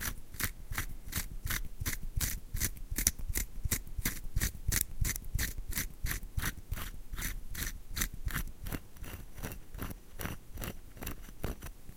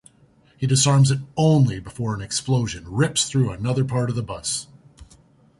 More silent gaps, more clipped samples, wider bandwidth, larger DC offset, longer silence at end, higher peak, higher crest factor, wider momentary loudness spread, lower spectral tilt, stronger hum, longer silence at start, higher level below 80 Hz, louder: neither; neither; first, 17 kHz vs 11.5 kHz; neither; second, 0 s vs 0.55 s; about the same, -6 dBFS vs -6 dBFS; first, 30 dB vs 16 dB; about the same, 12 LU vs 11 LU; second, -2.5 dB/octave vs -5 dB/octave; neither; second, 0 s vs 0.6 s; first, -40 dBFS vs -48 dBFS; second, -38 LUFS vs -21 LUFS